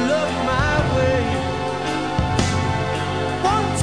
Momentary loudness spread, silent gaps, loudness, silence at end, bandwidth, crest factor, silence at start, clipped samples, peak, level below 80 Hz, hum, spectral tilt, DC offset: 4 LU; none; -21 LUFS; 0 s; 10.5 kHz; 16 dB; 0 s; under 0.1%; -4 dBFS; -34 dBFS; none; -5.5 dB/octave; 0.8%